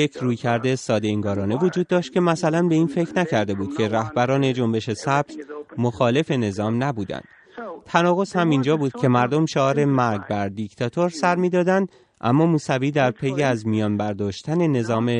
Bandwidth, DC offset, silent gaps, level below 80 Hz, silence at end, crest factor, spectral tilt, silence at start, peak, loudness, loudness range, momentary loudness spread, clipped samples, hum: 10.5 kHz; under 0.1%; none; -62 dBFS; 0 s; 18 dB; -6.5 dB/octave; 0 s; -2 dBFS; -21 LUFS; 2 LU; 7 LU; under 0.1%; none